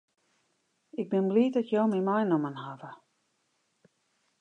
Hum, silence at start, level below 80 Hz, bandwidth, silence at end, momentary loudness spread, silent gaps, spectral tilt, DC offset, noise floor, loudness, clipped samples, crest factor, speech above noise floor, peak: none; 0.95 s; -84 dBFS; 7.8 kHz; 1.45 s; 17 LU; none; -8.5 dB/octave; under 0.1%; -75 dBFS; -28 LUFS; under 0.1%; 18 dB; 48 dB; -14 dBFS